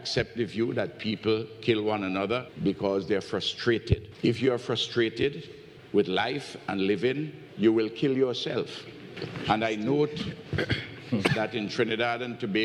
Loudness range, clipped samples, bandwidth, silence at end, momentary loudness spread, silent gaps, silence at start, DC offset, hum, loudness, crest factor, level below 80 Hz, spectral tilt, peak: 1 LU; under 0.1%; 11 kHz; 0 s; 8 LU; none; 0 s; under 0.1%; none; -28 LUFS; 18 dB; -52 dBFS; -6 dB/octave; -10 dBFS